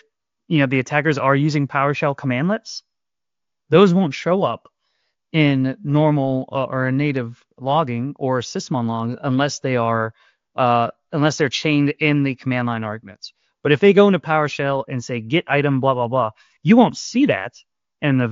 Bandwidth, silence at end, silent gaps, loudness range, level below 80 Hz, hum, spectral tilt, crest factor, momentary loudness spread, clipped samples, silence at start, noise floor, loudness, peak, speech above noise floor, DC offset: 7.6 kHz; 0 s; none; 4 LU; -62 dBFS; none; -6.5 dB/octave; 18 dB; 12 LU; under 0.1%; 0.5 s; -88 dBFS; -19 LUFS; -2 dBFS; 70 dB; under 0.1%